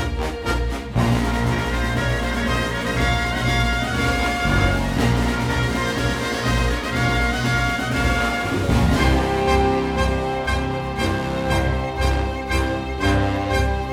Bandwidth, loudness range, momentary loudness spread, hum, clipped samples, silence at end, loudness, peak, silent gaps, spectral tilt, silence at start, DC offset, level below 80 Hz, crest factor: 16.5 kHz; 2 LU; 4 LU; none; under 0.1%; 0 s; -21 LUFS; -4 dBFS; none; -5.5 dB/octave; 0 s; under 0.1%; -26 dBFS; 16 dB